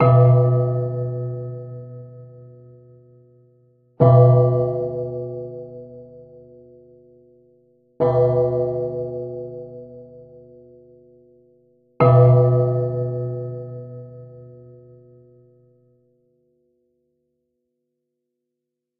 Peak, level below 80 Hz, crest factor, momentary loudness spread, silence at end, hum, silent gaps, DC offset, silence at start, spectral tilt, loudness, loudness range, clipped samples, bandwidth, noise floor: 0 dBFS; -54 dBFS; 22 dB; 26 LU; 4.5 s; none; none; under 0.1%; 0 s; -12.5 dB/octave; -18 LUFS; 14 LU; under 0.1%; 3.3 kHz; -81 dBFS